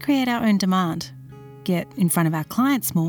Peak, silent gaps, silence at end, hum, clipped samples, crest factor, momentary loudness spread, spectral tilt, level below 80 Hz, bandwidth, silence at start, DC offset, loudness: -8 dBFS; none; 0 s; none; under 0.1%; 14 dB; 12 LU; -5.5 dB/octave; -58 dBFS; over 20 kHz; 0 s; under 0.1%; -22 LUFS